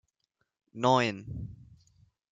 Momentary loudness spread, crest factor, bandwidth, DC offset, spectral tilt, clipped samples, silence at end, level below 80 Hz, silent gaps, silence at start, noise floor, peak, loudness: 20 LU; 22 dB; 9.4 kHz; under 0.1%; -5.5 dB/octave; under 0.1%; 0.75 s; -58 dBFS; none; 0.75 s; -80 dBFS; -10 dBFS; -28 LUFS